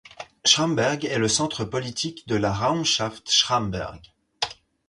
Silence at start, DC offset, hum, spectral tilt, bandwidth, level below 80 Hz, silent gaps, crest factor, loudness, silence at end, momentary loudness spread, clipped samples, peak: 0.2 s; under 0.1%; none; -3 dB/octave; 11.5 kHz; -52 dBFS; none; 22 dB; -23 LUFS; 0.35 s; 11 LU; under 0.1%; -4 dBFS